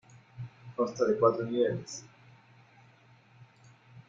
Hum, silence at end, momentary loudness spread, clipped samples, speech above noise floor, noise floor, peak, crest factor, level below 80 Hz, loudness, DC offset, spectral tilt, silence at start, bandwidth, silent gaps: none; 0.1 s; 20 LU; under 0.1%; 31 dB; -60 dBFS; -10 dBFS; 22 dB; -72 dBFS; -30 LUFS; under 0.1%; -6 dB/octave; 0.15 s; 7.8 kHz; none